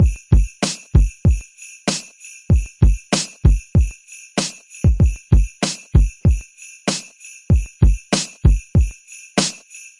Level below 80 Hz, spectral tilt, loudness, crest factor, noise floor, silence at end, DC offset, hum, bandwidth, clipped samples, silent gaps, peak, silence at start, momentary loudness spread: -20 dBFS; -5 dB/octave; -19 LUFS; 16 dB; -41 dBFS; 0.2 s; under 0.1%; none; 11.5 kHz; under 0.1%; none; 0 dBFS; 0 s; 10 LU